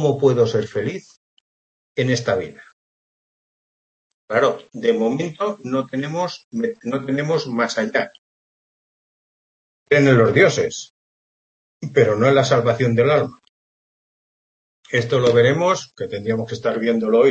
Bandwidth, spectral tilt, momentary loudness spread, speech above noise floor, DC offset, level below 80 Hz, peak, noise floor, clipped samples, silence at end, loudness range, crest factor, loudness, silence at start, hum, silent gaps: 8.4 kHz; -6 dB/octave; 11 LU; over 72 dB; under 0.1%; -60 dBFS; -2 dBFS; under -90 dBFS; under 0.1%; 0 s; 7 LU; 18 dB; -19 LUFS; 0 s; none; 1.17-1.95 s, 2.73-4.28 s, 6.44-6.51 s, 8.18-9.86 s, 10.90-11.80 s, 13.49-14.83 s